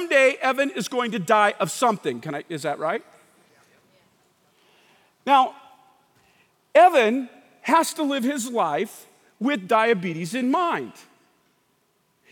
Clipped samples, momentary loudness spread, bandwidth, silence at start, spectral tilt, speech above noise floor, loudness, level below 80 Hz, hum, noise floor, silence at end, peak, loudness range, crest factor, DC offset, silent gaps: under 0.1%; 13 LU; 18.5 kHz; 0 s; -4 dB/octave; 46 dB; -22 LUFS; -84 dBFS; none; -67 dBFS; 1.4 s; -4 dBFS; 6 LU; 20 dB; under 0.1%; none